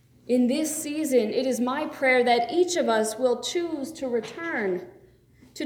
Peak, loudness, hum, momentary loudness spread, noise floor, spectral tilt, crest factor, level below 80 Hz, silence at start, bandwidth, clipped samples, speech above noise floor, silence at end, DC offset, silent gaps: -8 dBFS; -25 LUFS; none; 8 LU; -55 dBFS; -3 dB/octave; 16 dB; -66 dBFS; 0.3 s; 19 kHz; under 0.1%; 31 dB; 0 s; under 0.1%; none